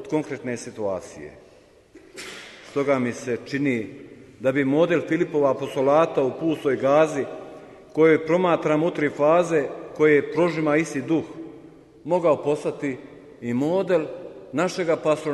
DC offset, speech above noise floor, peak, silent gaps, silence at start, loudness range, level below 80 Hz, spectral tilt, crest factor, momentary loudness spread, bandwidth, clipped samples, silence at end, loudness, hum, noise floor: under 0.1%; 29 dB; -6 dBFS; none; 0 s; 7 LU; -64 dBFS; -6.5 dB/octave; 18 dB; 18 LU; 12 kHz; under 0.1%; 0 s; -23 LUFS; none; -51 dBFS